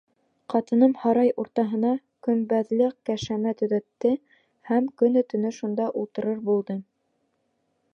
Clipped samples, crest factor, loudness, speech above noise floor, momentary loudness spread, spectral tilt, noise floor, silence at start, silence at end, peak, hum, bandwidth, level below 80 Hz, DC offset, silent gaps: under 0.1%; 18 dB; -25 LUFS; 49 dB; 8 LU; -7 dB/octave; -73 dBFS; 0.5 s; 1.1 s; -8 dBFS; none; 7 kHz; -66 dBFS; under 0.1%; none